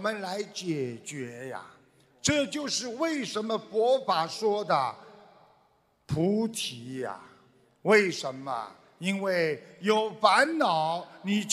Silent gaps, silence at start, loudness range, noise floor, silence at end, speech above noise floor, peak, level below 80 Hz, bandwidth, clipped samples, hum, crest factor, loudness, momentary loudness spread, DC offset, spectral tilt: none; 0 s; 5 LU; -67 dBFS; 0 s; 39 dB; -6 dBFS; -66 dBFS; 15 kHz; under 0.1%; none; 22 dB; -28 LUFS; 15 LU; under 0.1%; -4 dB/octave